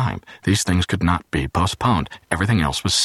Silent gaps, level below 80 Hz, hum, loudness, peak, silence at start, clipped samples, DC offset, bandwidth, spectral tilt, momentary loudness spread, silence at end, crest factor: none; -36 dBFS; none; -20 LUFS; -2 dBFS; 0 s; under 0.1%; under 0.1%; 13 kHz; -4.5 dB/octave; 5 LU; 0 s; 18 dB